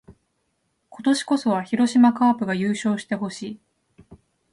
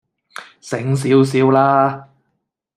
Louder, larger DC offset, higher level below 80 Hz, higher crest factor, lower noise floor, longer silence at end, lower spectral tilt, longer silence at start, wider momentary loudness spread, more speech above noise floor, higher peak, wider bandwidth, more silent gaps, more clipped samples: second, -21 LUFS vs -15 LUFS; neither; about the same, -64 dBFS vs -60 dBFS; about the same, 18 dB vs 16 dB; about the same, -72 dBFS vs -72 dBFS; second, 0.35 s vs 0.75 s; second, -5.5 dB/octave vs -7 dB/octave; second, 0.1 s vs 0.4 s; second, 15 LU vs 23 LU; second, 51 dB vs 57 dB; second, -6 dBFS vs -2 dBFS; second, 11.5 kHz vs 13 kHz; neither; neither